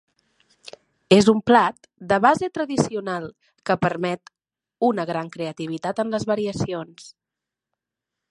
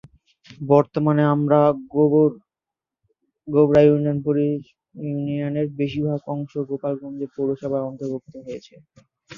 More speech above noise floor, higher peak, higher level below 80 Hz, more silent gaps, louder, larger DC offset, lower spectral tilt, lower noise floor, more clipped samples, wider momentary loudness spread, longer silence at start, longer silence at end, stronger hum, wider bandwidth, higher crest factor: about the same, 65 dB vs 68 dB; about the same, 0 dBFS vs -2 dBFS; about the same, -58 dBFS vs -58 dBFS; neither; about the same, -22 LUFS vs -21 LUFS; neither; second, -5.5 dB/octave vs -9.5 dB/octave; about the same, -86 dBFS vs -88 dBFS; neither; about the same, 15 LU vs 15 LU; first, 1.1 s vs 0.5 s; first, 1.2 s vs 0 s; neither; first, 11.5 kHz vs 7 kHz; about the same, 22 dB vs 20 dB